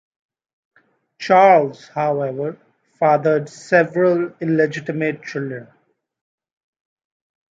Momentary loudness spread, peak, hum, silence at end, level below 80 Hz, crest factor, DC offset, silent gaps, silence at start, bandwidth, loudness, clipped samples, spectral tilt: 14 LU; -2 dBFS; none; 1.95 s; -72 dBFS; 18 dB; under 0.1%; none; 1.2 s; 7.8 kHz; -18 LUFS; under 0.1%; -7 dB/octave